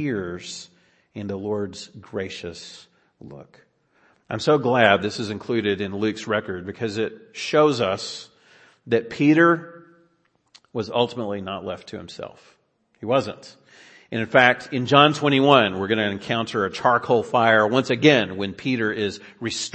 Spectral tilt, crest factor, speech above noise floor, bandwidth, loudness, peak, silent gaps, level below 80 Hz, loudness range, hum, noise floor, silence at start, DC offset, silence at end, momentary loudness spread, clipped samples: -5 dB/octave; 22 dB; 44 dB; 8.8 kHz; -21 LUFS; 0 dBFS; none; -64 dBFS; 12 LU; none; -66 dBFS; 0 s; under 0.1%; 0.05 s; 18 LU; under 0.1%